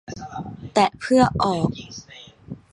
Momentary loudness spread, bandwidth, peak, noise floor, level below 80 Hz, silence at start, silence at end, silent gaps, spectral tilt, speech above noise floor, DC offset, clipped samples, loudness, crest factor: 22 LU; 11.5 kHz; -4 dBFS; -40 dBFS; -46 dBFS; 0.1 s; 0.15 s; none; -6 dB/octave; 21 dB; under 0.1%; under 0.1%; -20 LUFS; 20 dB